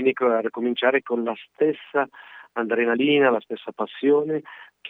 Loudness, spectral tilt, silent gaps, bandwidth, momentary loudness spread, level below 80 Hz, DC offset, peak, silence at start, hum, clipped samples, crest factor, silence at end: -23 LUFS; -7.5 dB/octave; none; 4 kHz; 12 LU; -82 dBFS; under 0.1%; -4 dBFS; 0 s; none; under 0.1%; 18 dB; 0 s